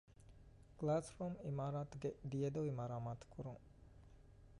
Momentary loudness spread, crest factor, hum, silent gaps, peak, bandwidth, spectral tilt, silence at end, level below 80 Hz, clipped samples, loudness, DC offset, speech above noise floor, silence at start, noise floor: 25 LU; 16 dB; none; none; -28 dBFS; 11 kHz; -8 dB/octave; 0 s; -66 dBFS; under 0.1%; -45 LUFS; under 0.1%; 19 dB; 0.1 s; -63 dBFS